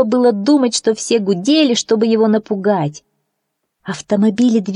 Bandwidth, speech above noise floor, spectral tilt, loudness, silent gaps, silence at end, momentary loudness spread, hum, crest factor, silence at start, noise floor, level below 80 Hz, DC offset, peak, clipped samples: 11 kHz; 59 dB; -5 dB/octave; -15 LUFS; none; 0 s; 8 LU; none; 12 dB; 0 s; -73 dBFS; -64 dBFS; under 0.1%; -2 dBFS; under 0.1%